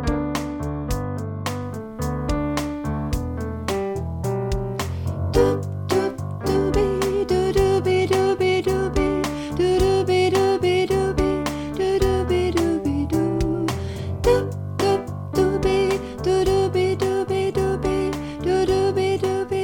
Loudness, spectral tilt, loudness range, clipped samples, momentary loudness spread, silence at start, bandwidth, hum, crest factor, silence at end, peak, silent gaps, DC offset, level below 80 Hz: -22 LUFS; -6.5 dB/octave; 6 LU; under 0.1%; 8 LU; 0 s; 17.5 kHz; none; 16 dB; 0 s; -4 dBFS; none; under 0.1%; -34 dBFS